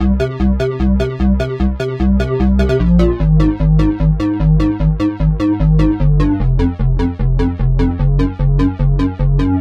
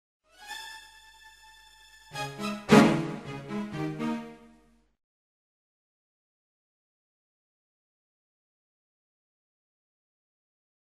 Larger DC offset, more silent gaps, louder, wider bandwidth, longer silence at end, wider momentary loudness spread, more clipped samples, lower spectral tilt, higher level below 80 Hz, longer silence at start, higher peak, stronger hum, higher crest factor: neither; neither; first, -15 LUFS vs -27 LUFS; second, 6.8 kHz vs 15 kHz; second, 0 s vs 6.45 s; second, 3 LU vs 22 LU; neither; first, -9.5 dB/octave vs -5.5 dB/octave; first, -16 dBFS vs -64 dBFS; second, 0 s vs 0.4 s; first, 0 dBFS vs -4 dBFS; neither; second, 12 dB vs 28 dB